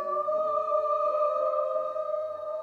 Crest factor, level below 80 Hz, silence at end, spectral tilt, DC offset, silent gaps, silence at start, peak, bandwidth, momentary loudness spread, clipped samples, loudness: 12 dB; -80 dBFS; 0 s; -5.5 dB/octave; under 0.1%; none; 0 s; -16 dBFS; 6.6 kHz; 6 LU; under 0.1%; -28 LUFS